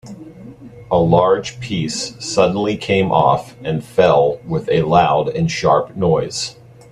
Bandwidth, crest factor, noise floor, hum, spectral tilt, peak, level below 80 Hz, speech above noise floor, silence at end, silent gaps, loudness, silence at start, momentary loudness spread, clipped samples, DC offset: 12 kHz; 16 dB; -37 dBFS; none; -5.5 dB/octave; 0 dBFS; -46 dBFS; 21 dB; 0.4 s; none; -16 LUFS; 0.05 s; 11 LU; under 0.1%; under 0.1%